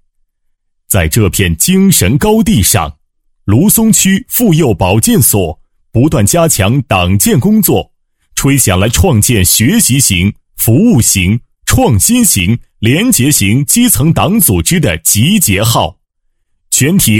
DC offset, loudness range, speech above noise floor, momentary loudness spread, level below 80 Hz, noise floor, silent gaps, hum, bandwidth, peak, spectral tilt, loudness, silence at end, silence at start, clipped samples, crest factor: under 0.1%; 1 LU; 52 dB; 6 LU; -28 dBFS; -60 dBFS; none; none; over 20 kHz; 0 dBFS; -4 dB/octave; -9 LUFS; 0 s; 0.9 s; 0.2%; 10 dB